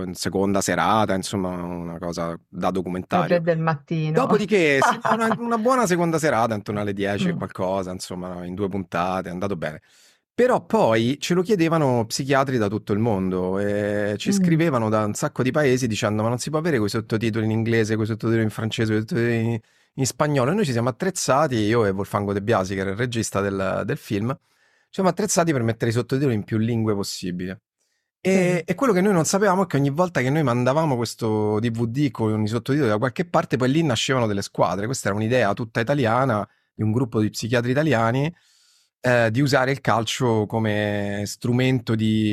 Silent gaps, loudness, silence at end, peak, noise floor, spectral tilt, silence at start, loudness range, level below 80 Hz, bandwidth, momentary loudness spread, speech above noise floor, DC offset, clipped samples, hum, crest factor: none; -22 LUFS; 0 s; -4 dBFS; -73 dBFS; -5.5 dB/octave; 0 s; 3 LU; -58 dBFS; 14.5 kHz; 8 LU; 52 dB; under 0.1%; under 0.1%; none; 18 dB